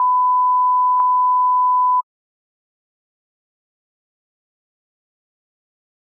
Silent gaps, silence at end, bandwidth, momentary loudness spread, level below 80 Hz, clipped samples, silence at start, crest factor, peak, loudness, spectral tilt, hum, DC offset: none; 4 s; 1.6 kHz; 1 LU; under -90 dBFS; under 0.1%; 0 s; 12 dB; -8 dBFS; -15 LUFS; 8.5 dB/octave; none; under 0.1%